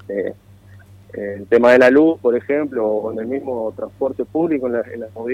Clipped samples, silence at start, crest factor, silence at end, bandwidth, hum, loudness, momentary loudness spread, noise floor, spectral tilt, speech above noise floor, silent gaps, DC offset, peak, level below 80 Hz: under 0.1%; 0.1 s; 14 dB; 0 s; 11 kHz; 50 Hz at -50 dBFS; -17 LUFS; 18 LU; -44 dBFS; -7 dB/octave; 27 dB; none; under 0.1%; -4 dBFS; -58 dBFS